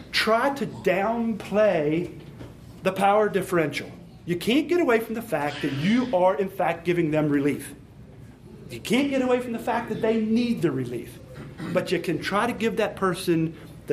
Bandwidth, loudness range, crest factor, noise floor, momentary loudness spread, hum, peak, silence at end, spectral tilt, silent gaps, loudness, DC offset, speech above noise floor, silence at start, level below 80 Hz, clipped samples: 15.5 kHz; 3 LU; 18 dB; -45 dBFS; 15 LU; none; -6 dBFS; 0 s; -6 dB/octave; none; -24 LUFS; under 0.1%; 21 dB; 0 s; -54 dBFS; under 0.1%